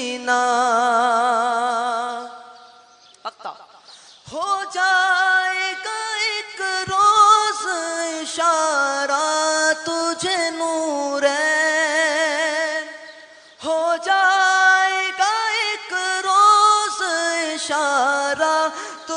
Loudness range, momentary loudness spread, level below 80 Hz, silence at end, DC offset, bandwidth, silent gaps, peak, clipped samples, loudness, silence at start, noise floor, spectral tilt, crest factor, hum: 5 LU; 11 LU; -70 dBFS; 0 s; under 0.1%; 10.5 kHz; none; -2 dBFS; under 0.1%; -18 LUFS; 0 s; -50 dBFS; -0.5 dB/octave; 16 dB; none